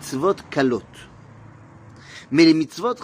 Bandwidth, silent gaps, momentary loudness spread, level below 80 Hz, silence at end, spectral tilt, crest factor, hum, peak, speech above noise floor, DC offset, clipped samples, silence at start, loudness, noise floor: 15.5 kHz; none; 18 LU; -58 dBFS; 0 s; -5.5 dB/octave; 20 dB; none; -2 dBFS; 25 dB; under 0.1%; under 0.1%; 0 s; -20 LUFS; -45 dBFS